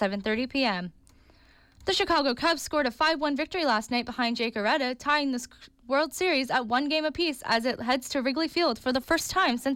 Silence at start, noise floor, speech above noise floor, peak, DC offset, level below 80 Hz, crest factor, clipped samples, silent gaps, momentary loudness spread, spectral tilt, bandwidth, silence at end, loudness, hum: 0 s; -58 dBFS; 31 dB; -14 dBFS; under 0.1%; -56 dBFS; 14 dB; under 0.1%; none; 5 LU; -3 dB/octave; 17 kHz; 0 s; -27 LUFS; none